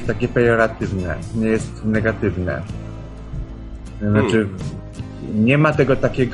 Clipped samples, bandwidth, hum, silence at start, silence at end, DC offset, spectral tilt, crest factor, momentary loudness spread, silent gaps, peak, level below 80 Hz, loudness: under 0.1%; 11 kHz; none; 0 s; 0 s; under 0.1%; -7.5 dB/octave; 18 dB; 17 LU; none; -2 dBFS; -34 dBFS; -19 LUFS